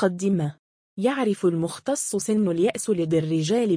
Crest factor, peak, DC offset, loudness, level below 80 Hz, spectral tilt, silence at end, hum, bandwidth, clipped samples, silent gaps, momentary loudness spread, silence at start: 14 dB; -8 dBFS; under 0.1%; -24 LUFS; -64 dBFS; -5.5 dB/octave; 0 s; none; 10.5 kHz; under 0.1%; 0.59-0.96 s; 4 LU; 0 s